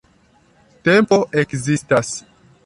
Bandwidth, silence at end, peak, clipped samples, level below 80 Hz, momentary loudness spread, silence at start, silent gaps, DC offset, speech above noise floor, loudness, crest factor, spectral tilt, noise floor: 11.5 kHz; 0.45 s; -2 dBFS; under 0.1%; -54 dBFS; 11 LU; 0.85 s; none; under 0.1%; 39 dB; -17 LUFS; 16 dB; -5 dB/octave; -55 dBFS